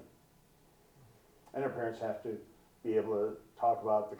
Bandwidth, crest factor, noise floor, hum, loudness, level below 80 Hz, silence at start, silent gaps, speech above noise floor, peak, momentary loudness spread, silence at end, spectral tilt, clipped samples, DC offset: 19.5 kHz; 18 dB; -65 dBFS; none; -36 LUFS; -74 dBFS; 0 s; none; 31 dB; -20 dBFS; 11 LU; 0 s; -7.5 dB/octave; under 0.1%; under 0.1%